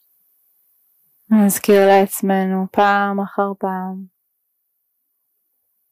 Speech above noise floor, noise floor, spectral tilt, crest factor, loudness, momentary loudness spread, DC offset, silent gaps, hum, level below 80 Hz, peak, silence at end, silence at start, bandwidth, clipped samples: 55 dB; -71 dBFS; -5.5 dB/octave; 16 dB; -16 LUFS; 12 LU; under 0.1%; none; none; -66 dBFS; -4 dBFS; 1.85 s; 1.3 s; 15.5 kHz; under 0.1%